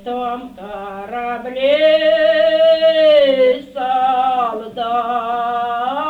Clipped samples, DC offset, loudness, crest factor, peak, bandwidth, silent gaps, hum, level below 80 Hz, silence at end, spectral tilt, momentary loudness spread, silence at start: under 0.1%; under 0.1%; -15 LUFS; 12 dB; -2 dBFS; 4.9 kHz; none; none; -54 dBFS; 0 s; -4.5 dB/octave; 14 LU; 0.05 s